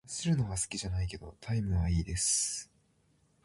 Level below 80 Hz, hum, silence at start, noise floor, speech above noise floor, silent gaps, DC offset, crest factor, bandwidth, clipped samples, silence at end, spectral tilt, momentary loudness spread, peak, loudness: -42 dBFS; none; 0.05 s; -70 dBFS; 38 dB; none; under 0.1%; 16 dB; 11.5 kHz; under 0.1%; 0.8 s; -4 dB/octave; 10 LU; -18 dBFS; -32 LUFS